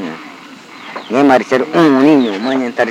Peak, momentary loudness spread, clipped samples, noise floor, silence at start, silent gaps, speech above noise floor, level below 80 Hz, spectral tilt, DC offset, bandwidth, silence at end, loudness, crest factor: 0 dBFS; 20 LU; 0.2%; -35 dBFS; 0 s; none; 24 dB; -60 dBFS; -6 dB/octave; under 0.1%; 10.5 kHz; 0 s; -12 LUFS; 12 dB